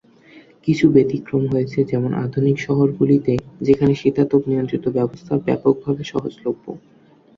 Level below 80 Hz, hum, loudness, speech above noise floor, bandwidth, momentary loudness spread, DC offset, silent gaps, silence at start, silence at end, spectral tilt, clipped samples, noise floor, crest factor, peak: -52 dBFS; none; -19 LUFS; 29 dB; 7.4 kHz; 10 LU; under 0.1%; none; 0.35 s; 0.6 s; -8.5 dB/octave; under 0.1%; -47 dBFS; 18 dB; -2 dBFS